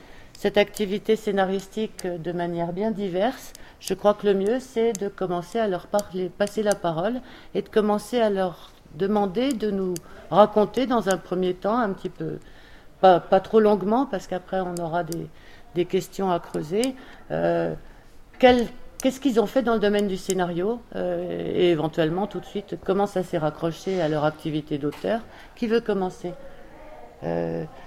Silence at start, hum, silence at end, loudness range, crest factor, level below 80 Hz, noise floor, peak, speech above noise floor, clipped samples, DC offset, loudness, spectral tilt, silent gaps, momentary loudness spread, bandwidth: 0.15 s; none; 0 s; 4 LU; 24 dB; -50 dBFS; -46 dBFS; -2 dBFS; 22 dB; under 0.1%; under 0.1%; -24 LUFS; -5.5 dB/octave; none; 12 LU; 16 kHz